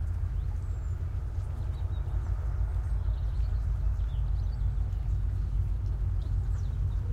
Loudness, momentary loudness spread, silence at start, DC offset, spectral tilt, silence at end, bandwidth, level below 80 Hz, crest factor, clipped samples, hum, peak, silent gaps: -33 LUFS; 3 LU; 0 s; under 0.1%; -8.5 dB/octave; 0 s; 4.7 kHz; -32 dBFS; 10 dB; under 0.1%; none; -18 dBFS; none